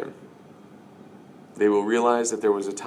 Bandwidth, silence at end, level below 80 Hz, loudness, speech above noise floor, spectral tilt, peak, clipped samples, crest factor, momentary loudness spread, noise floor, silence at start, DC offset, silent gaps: 12 kHz; 0 s; -76 dBFS; -22 LUFS; 26 dB; -4 dB/octave; -8 dBFS; under 0.1%; 18 dB; 4 LU; -48 dBFS; 0 s; under 0.1%; none